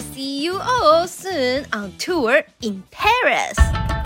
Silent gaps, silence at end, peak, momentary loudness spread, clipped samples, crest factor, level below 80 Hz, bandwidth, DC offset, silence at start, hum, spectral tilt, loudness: none; 0 s; -2 dBFS; 12 LU; under 0.1%; 18 dB; -28 dBFS; 16.5 kHz; under 0.1%; 0 s; none; -4.5 dB/octave; -19 LUFS